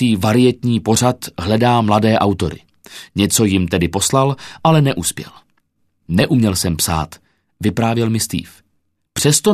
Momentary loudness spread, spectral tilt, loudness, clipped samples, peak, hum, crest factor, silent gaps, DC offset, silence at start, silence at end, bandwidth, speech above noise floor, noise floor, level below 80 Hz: 11 LU; -5 dB/octave; -16 LUFS; under 0.1%; 0 dBFS; none; 16 dB; none; under 0.1%; 0 s; 0 s; 14 kHz; 50 dB; -66 dBFS; -42 dBFS